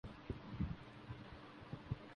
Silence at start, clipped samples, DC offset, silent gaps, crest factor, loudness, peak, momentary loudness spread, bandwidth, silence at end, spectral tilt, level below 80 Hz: 0.05 s; under 0.1%; under 0.1%; none; 20 dB; -50 LUFS; -28 dBFS; 9 LU; 10 kHz; 0 s; -8 dB/octave; -56 dBFS